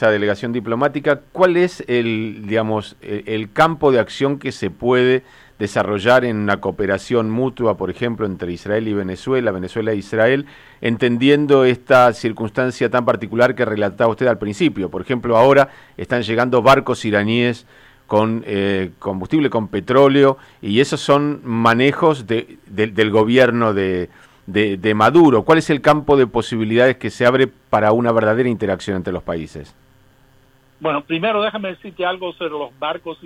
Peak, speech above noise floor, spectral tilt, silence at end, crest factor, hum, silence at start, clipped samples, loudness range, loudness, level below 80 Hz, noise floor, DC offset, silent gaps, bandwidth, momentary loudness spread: -2 dBFS; 36 dB; -6.5 dB/octave; 0.1 s; 14 dB; none; 0 s; under 0.1%; 5 LU; -17 LUFS; -50 dBFS; -52 dBFS; under 0.1%; none; 15 kHz; 12 LU